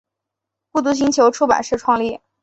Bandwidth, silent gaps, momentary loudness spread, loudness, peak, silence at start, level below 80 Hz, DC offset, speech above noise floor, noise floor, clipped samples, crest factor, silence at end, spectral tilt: 8.2 kHz; none; 8 LU; -17 LUFS; 0 dBFS; 0.75 s; -54 dBFS; under 0.1%; 66 dB; -82 dBFS; under 0.1%; 18 dB; 0.25 s; -3.5 dB/octave